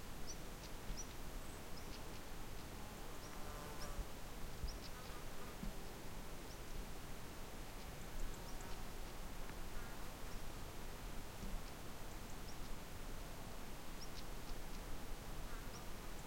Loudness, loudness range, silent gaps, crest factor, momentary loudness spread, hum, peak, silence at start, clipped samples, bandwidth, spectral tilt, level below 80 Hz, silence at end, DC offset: -52 LUFS; 1 LU; none; 14 dB; 2 LU; none; -32 dBFS; 0 s; under 0.1%; 16.5 kHz; -4 dB/octave; -50 dBFS; 0 s; under 0.1%